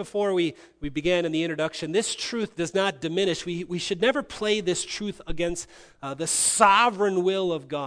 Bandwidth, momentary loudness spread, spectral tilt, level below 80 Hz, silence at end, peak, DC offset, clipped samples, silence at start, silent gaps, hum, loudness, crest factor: 11 kHz; 13 LU; -3 dB/octave; -50 dBFS; 0 s; -2 dBFS; under 0.1%; under 0.1%; 0 s; none; none; -25 LUFS; 24 dB